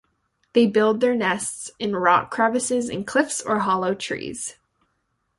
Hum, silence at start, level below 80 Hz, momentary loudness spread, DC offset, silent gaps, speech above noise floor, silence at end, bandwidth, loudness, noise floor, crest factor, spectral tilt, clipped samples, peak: none; 0.55 s; -62 dBFS; 10 LU; under 0.1%; none; 51 dB; 0.85 s; 11.5 kHz; -22 LUFS; -72 dBFS; 20 dB; -4 dB/octave; under 0.1%; -4 dBFS